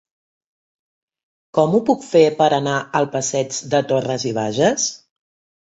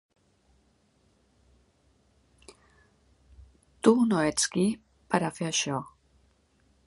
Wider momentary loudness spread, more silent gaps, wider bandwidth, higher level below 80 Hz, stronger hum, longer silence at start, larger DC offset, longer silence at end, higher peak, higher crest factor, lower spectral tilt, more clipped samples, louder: second, 7 LU vs 12 LU; neither; second, 8 kHz vs 11.5 kHz; about the same, -62 dBFS vs -62 dBFS; neither; second, 1.55 s vs 3.4 s; neither; second, 0.85 s vs 1 s; first, -2 dBFS vs -8 dBFS; second, 18 dB vs 24 dB; about the same, -4.5 dB/octave vs -4 dB/octave; neither; first, -18 LUFS vs -27 LUFS